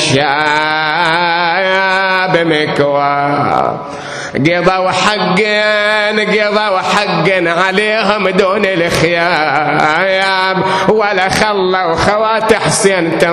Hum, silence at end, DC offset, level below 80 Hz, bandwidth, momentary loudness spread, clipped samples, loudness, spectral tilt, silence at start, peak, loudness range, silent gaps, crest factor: none; 0 s; under 0.1%; -42 dBFS; 14 kHz; 2 LU; 0.1%; -11 LUFS; -4 dB/octave; 0 s; 0 dBFS; 1 LU; none; 12 dB